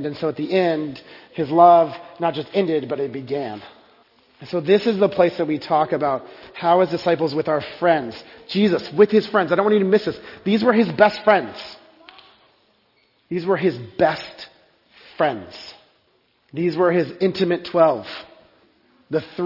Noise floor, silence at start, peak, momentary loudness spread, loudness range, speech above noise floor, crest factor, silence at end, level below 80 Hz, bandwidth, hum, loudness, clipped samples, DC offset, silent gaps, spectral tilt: -63 dBFS; 0 s; 0 dBFS; 18 LU; 7 LU; 43 dB; 20 dB; 0 s; -64 dBFS; 5.8 kHz; none; -19 LUFS; under 0.1%; under 0.1%; none; -7.5 dB/octave